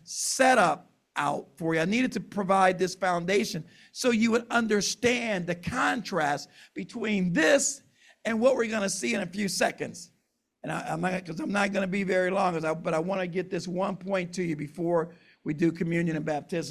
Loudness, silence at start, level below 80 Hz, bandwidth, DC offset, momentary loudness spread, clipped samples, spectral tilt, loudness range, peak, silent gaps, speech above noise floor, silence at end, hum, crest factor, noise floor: -27 LUFS; 0.05 s; -62 dBFS; 15.5 kHz; under 0.1%; 12 LU; under 0.1%; -4 dB/octave; 4 LU; -8 dBFS; none; 48 dB; 0 s; none; 18 dB; -75 dBFS